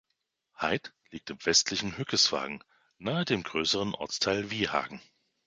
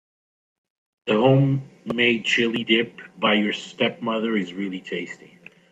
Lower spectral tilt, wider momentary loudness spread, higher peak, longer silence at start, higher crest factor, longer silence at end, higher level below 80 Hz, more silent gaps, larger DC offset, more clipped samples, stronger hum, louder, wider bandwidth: second, -2.5 dB/octave vs -6 dB/octave; first, 18 LU vs 13 LU; second, -10 dBFS vs -4 dBFS; second, 0.6 s vs 1.05 s; about the same, 22 dB vs 18 dB; about the same, 0.45 s vs 0.55 s; about the same, -62 dBFS vs -66 dBFS; neither; neither; neither; neither; second, -29 LUFS vs -22 LUFS; first, 11 kHz vs 8.4 kHz